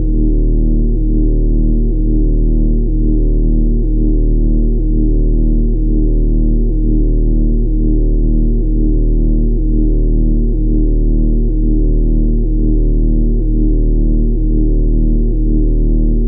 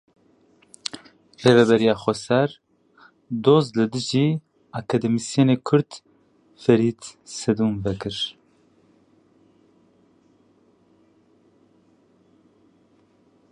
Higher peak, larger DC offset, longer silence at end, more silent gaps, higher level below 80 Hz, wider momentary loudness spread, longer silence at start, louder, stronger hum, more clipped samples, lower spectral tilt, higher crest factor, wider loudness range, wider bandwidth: about the same, -4 dBFS vs -2 dBFS; neither; second, 0 s vs 5.2 s; neither; first, -12 dBFS vs -58 dBFS; second, 1 LU vs 16 LU; second, 0 s vs 0.95 s; first, -16 LUFS vs -21 LUFS; neither; neither; first, -19 dB/octave vs -6 dB/octave; second, 6 dB vs 22 dB; second, 0 LU vs 9 LU; second, 0.8 kHz vs 11 kHz